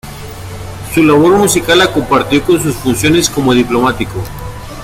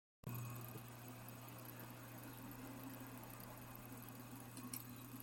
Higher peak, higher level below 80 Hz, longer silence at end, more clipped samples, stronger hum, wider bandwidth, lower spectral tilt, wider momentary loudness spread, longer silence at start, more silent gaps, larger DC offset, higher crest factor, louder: first, 0 dBFS vs -30 dBFS; first, -32 dBFS vs -72 dBFS; about the same, 0 s vs 0 s; neither; neither; about the same, 17 kHz vs 17 kHz; about the same, -4.5 dB/octave vs -5 dB/octave; first, 18 LU vs 4 LU; second, 0.05 s vs 0.25 s; neither; neither; second, 12 dB vs 22 dB; first, -11 LUFS vs -53 LUFS